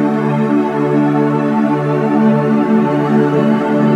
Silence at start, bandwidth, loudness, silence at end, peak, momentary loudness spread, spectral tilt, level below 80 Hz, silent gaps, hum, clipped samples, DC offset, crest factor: 0 s; 8 kHz; -13 LUFS; 0 s; -2 dBFS; 2 LU; -9 dB/octave; -70 dBFS; none; none; under 0.1%; under 0.1%; 12 dB